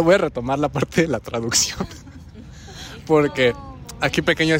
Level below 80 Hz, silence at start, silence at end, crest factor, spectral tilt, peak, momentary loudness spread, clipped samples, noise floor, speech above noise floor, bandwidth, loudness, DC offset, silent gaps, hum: -44 dBFS; 0 s; 0 s; 18 dB; -4 dB/octave; -4 dBFS; 21 LU; under 0.1%; -39 dBFS; 20 dB; 16 kHz; -20 LUFS; under 0.1%; none; none